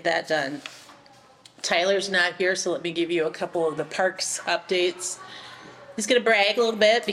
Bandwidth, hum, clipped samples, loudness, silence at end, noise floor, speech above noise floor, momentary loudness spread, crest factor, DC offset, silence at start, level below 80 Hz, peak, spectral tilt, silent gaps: 14.5 kHz; none; under 0.1%; -23 LUFS; 0 s; -53 dBFS; 29 dB; 17 LU; 16 dB; under 0.1%; 0 s; -72 dBFS; -8 dBFS; -2.5 dB/octave; none